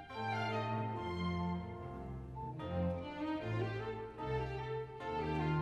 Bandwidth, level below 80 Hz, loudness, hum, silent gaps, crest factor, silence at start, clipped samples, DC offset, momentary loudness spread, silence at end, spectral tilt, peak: 10 kHz; -54 dBFS; -40 LUFS; none; none; 14 dB; 0 s; under 0.1%; under 0.1%; 8 LU; 0 s; -8 dB/octave; -24 dBFS